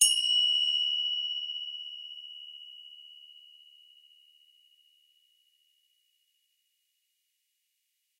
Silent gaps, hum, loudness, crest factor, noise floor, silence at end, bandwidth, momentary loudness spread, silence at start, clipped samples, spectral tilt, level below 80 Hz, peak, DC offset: none; none; -27 LUFS; 28 dB; -79 dBFS; 4.85 s; 16 kHz; 25 LU; 0 s; under 0.1%; 12.5 dB/octave; under -90 dBFS; -6 dBFS; under 0.1%